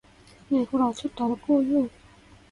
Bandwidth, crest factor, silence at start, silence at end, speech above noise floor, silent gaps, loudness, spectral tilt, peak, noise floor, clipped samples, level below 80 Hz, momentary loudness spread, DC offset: 10.5 kHz; 16 dB; 0.5 s; 0.65 s; 29 dB; none; -26 LUFS; -6.5 dB/octave; -12 dBFS; -53 dBFS; under 0.1%; -58 dBFS; 6 LU; under 0.1%